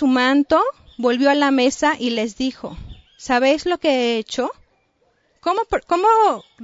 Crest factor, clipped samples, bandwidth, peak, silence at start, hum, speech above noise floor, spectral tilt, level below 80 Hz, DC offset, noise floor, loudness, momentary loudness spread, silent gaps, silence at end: 16 dB; under 0.1%; 7.8 kHz; -4 dBFS; 0 s; none; 45 dB; -3.5 dB/octave; -48 dBFS; under 0.1%; -63 dBFS; -18 LUFS; 11 LU; none; 0.25 s